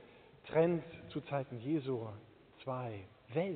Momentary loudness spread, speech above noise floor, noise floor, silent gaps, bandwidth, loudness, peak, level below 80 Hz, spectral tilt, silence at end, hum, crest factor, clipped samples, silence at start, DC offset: 17 LU; 21 dB; -57 dBFS; none; 4.5 kHz; -38 LUFS; -18 dBFS; -72 dBFS; -7 dB/octave; 0 s; none; 20 dB; under 0.1%; 0 s; under 0.1%